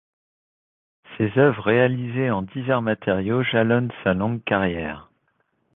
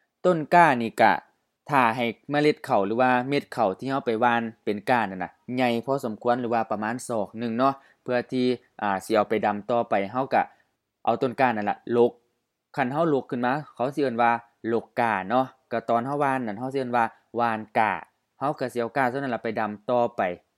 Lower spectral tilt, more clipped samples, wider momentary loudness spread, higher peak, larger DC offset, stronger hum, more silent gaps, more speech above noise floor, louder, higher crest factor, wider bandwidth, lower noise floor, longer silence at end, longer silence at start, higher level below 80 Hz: first, -10.5 dB/octave vs -6 dB/octave; neither; about the same, 8 LU vs 8 LU; about the same, -4 dBFS vs -2 dBFS; neither; neither; neither; about the same, 48 dB vs 51 dB; first, -22 LUFS vs -25 LUFS; about the same, 20 dB vs 22 dB; second, 4 kHz vs 14 kHz; second, -69 dBFS vs -75 dBFS; first, 0.75 s vs 0.2 s; first, 1.1 s vs 0.25 s; first, -50 dBFS vs -74 dBFS